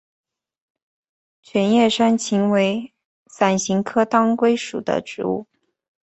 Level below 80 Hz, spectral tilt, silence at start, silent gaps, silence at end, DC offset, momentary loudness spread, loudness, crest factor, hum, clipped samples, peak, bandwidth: -62 dBFS; -5 dB/octave; 1.55 s; 3.05-3.26 s; 0.6 s; under 0.1%; 9 LU; -19 LUFS; 18 dB; none; under 0.1%; -2 dBFS; 8.2 kHz